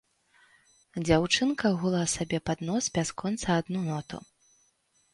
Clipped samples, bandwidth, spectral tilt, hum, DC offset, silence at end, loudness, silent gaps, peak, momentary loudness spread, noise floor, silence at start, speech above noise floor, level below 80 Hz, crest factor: under 0.1%; 11.5 kHz; -4.5 dB/octave; none; under 0.1%; 0.95 s; -28 LUFS; none; -8 dBFS; 11 LU; -70 dBFS; 0.95 s; 42 dB; -54 dBFS; 22 dB